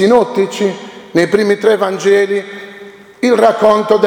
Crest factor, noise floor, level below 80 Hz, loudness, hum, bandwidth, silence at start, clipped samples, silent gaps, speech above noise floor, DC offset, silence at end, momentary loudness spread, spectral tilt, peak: 12 dB; -35 dBFS; -56 dBFS; -12 LUFS; none; 16 kHz; 0 s; 0.1%; none; 24 dB; under 0.1%; 0 s; 15 LU; -5 dB/octave; 0 dBFS